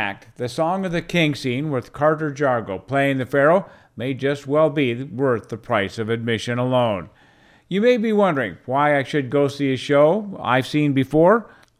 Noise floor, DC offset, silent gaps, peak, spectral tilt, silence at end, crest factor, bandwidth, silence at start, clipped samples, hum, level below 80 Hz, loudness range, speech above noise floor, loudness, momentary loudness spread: -53 dBFS; under 0.1%; none; -4 dBFS; -6.5 dB/octave; 0.35 s; 16 dB; 14.5 kHz; 0 s; under 0.1%; none; -56 dBFS; 3 LU; 33 dB; -20 LUFS; 8 LU